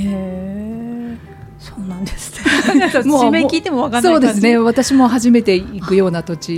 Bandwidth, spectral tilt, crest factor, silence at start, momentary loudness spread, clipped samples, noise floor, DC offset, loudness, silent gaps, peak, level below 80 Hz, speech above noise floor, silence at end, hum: 15.5 kHz; -5 dB/octave; 14 dB; 0 s; 14 LU; under 0.1%; -35 dBFS; under 0.1%; -14 LUFS; none; 0 dBFS; -40 dBFS; 22 dB; 0 s; none